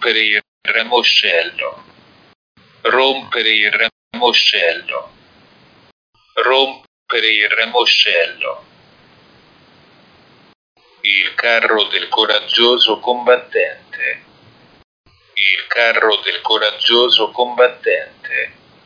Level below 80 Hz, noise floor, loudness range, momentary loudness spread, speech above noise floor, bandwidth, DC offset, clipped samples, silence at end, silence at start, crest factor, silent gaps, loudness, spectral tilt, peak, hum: -68 dBFS; -48 dBFS; 4 LU; 11 LU; 33 dB; 5.4 kHz; under 0.1%; under 0.1%; 0.35 s; 0 s; 16 dB; 0.48-0.61 s, 2.35-2.55 s, 3.92-4.11 s, 5.92-6.13 s, 6.87-7.06 s, 10.55-10.76 s, 14.84-15.04 s; -14 LUFS; -1.5 dB/octave; 0 dBFS; none